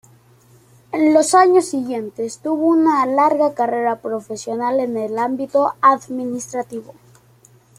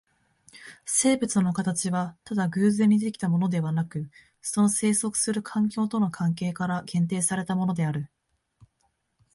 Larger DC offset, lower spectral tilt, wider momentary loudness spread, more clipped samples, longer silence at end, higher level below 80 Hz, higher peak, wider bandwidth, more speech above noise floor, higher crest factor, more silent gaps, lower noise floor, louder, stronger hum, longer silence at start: neither; about the same, -4 dB/octave vs -5 dB/octave; first, 14 LU vs 9 LU; neither; second, 0.95 s vs 1.3 s; about the same, -66 dBFS vs -64 dBFS; first, -2 dBFS vs -8 dBFS; first, 15 kHz vs 11.5 kHz; second, 34 dB vs 48 dB; about the same, 16 dB vs 18 dB; neither; second, -51 dBFS vs -73 dBFS; first, -18 LUFS vs -25 LUFS; neither; first, 0.95 s vs 0.55 s